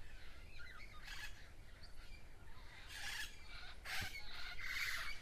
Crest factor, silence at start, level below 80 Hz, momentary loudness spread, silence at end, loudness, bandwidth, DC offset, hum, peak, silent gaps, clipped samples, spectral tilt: 18 dB; 0 s; -56 dBFS; 18 LU; 0 s; -48 LUFS; 15.5 kHz; under 0.1%; none; -28 dBFS; none; under 0.1%; -1.5 dB/octave